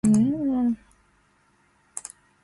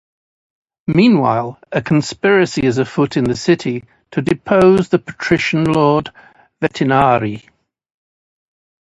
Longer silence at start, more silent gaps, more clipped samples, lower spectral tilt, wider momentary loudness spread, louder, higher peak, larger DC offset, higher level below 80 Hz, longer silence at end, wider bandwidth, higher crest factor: second, 0.05 s vs 0.9 s; neither; neither; about the same, -7 dB/octave vs -6.5 dB/octave; first, 18 LU vs 11 LU; second, -25 LUFS vs -15 LUFS; second, -10 dBFS vs 0 dBFS; neither; second, -56 dBFS vs -48 dBFS; second, 0.45 s vs 1.4 s; about the same, 11.5 kHz vs 11 kHz; about the same, 16 dB vs 16 dB